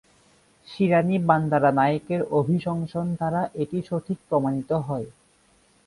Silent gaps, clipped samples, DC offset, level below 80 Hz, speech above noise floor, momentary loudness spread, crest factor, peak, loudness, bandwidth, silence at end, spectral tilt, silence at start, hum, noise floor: none; under 0.1%; under 0.1%; -60 dBFS; 38 dB; 9 LU; 20 dB; -4 dBFS; -24 LUFS; 11.5 kHz; 0.75 s; -8.5 dB/octave; 0.7 s; none; -61 dBFS